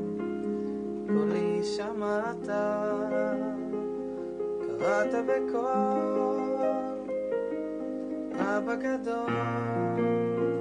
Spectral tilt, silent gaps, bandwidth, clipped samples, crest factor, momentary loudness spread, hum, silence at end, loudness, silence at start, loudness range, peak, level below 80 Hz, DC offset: -7 dB/octave; none; 10 kHz; under 0.1%; 16 dB; 7 LU; none; 0 s; -30 LUFS; 0 s; 2 LU; -14 dBFS; -64 dBFS; under 0.1%